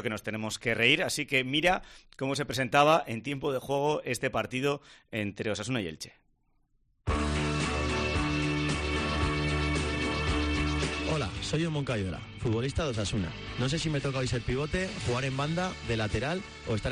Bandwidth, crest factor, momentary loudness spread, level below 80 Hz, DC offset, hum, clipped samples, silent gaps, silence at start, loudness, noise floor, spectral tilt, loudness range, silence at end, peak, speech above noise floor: 14 kHz; 22 dB; 9 LU; -42 dBFS; under 0.1%; none; under 0.1%; none; 0 s; -30 LUFS; -70 dBFS; -5 dB/octave; 6 LU; 0 s; -8 dBFS; 40 dB